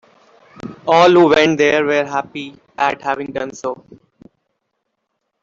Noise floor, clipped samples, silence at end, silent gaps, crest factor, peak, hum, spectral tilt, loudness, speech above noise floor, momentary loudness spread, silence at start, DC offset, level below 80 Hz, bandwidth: -73 dBFS; under 0.1%; 1.7 s; none; 16 dB; -2 dBFS; none; -5 dB/octave; -15 LUFS; 58 dB; 21 LU; 0.65 s; under 0.1%; -56 dBFS; 7.6 kHz